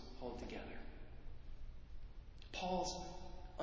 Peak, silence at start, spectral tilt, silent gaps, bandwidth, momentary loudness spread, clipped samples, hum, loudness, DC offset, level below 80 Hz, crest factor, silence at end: -28 dBFS; 0 s; -4.5 dB/octave; none; 7.6 kHz; 17 LU; under 0.1%; none; -47 LUFS; under 0.1%; -54 dBFS; 18 dB; 0 s